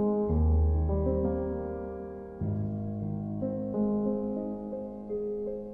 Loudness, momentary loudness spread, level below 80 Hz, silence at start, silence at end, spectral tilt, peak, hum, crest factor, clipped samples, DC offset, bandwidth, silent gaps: -31 LUFS; 11 LU; -36 dBFS; 0 s; 0 s; -13.5 dB/octave; -16 dBFS; none; 14 dB; under 0.1%; under 0.1%; 2.1 kHz; none